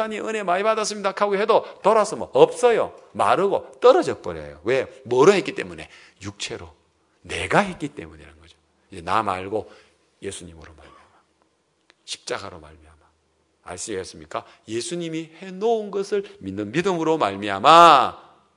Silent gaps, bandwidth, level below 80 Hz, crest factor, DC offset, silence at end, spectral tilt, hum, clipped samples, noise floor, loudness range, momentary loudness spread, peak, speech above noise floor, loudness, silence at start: none; 12 kHz; -60 dBFS; 22 dB; under 0.1%; 0.35 s; -4 dB/octave; none; under 0.1%; -66 dBFS; 16 LU; 18 LU; 0 dBFS; 45 dB; -20 LUFS; 0 s